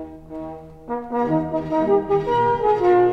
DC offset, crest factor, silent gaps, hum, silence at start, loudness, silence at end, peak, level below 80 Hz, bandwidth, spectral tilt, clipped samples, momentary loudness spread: 0.1%; 12 dB; none; none; 0 s; -20 LUFS; 0 s; -8 dBFS; -48 dBFS; 6 kHz; -8.5 dB/octave; under 0.1%; 17 LU